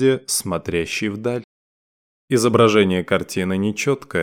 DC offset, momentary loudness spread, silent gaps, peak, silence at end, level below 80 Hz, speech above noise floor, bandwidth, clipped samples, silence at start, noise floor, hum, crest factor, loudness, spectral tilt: under 0.1%; 9 LU; 1.44-2.28 s; -4 dBFS; 0 s; -52 dBFS; over 71 dB; 17.5 kHz; under 0.1%; 0 s; under -90 dBFS; none; 16 dB; -19 LUFS; -4.5 dB/octave